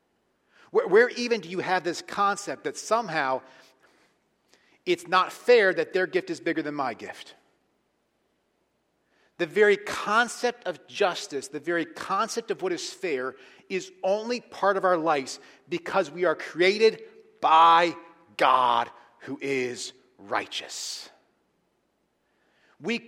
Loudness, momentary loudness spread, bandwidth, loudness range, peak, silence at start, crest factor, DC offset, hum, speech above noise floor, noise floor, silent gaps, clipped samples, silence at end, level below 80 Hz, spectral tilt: -25 LUFS; 15 LU; 15.5 kHz; 10 LU; -6 dBFS; 0.75 s; 22 dB; under 0.1%; none; 47 dB; -73 dBFS; none; under 0.1%; 0.1 s; -76 dBFS; -3.5 dB/octave